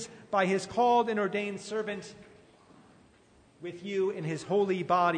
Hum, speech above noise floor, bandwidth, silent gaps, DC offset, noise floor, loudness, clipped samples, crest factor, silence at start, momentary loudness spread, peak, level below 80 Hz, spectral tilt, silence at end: none; 32 dB; 9.6 kHz; none; under 0.1%; -61 dBFS; -30 LUFS; under 0.1%; 18 dB; 0 s; 16 LU; -12 dBFS; -72 dBFS; -5.5 dB/octave; 0 s